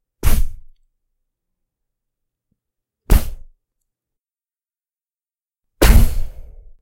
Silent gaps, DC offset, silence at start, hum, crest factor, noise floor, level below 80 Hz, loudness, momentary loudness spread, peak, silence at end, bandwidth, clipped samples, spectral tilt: none; under 0.1%; 0.25 s; none; 18 dB; under -90 dBFS; -20 dBFS; -18 LUFS; 19 LU; 0 dBFS; 0.4 s; 16 kHz; under 0.1%; -5 dB/octave